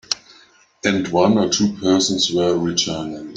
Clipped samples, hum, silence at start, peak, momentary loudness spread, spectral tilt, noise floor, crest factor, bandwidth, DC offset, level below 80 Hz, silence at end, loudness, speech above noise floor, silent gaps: under 0.1%; none; 0.1 s; 0 dBFS; 9 LU; -4 dB/octave; -51 dBFS; 18 dB; 9.4 kHz; under 0.1%; -54 dBFS; 0 s; -18 LUFS; 33 dB; none